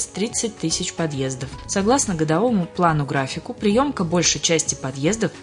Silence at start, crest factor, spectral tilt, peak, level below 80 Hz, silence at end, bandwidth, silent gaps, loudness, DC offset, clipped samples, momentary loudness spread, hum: 0 s; 18 dB; -4 dB/octave; -4 dBFS; -46 dBFS; 0 s; 11 kHz; none; -21 LUFS; under 0.1%; under 0.1%; 6 LU; none